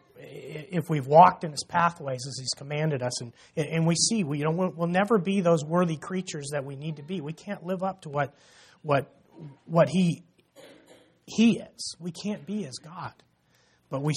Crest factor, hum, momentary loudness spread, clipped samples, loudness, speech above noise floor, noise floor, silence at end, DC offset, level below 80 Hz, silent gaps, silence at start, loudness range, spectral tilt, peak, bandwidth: 24 dB; none; 16 LU; under 0.1%; -27 LUFS; 39 dB; -65 dBFS; 0 s; under 0.1%; -68 dBFS; none; 0.15 s; 7 LU; -5 dB/octave; -4 dBFS; 13.5 kHz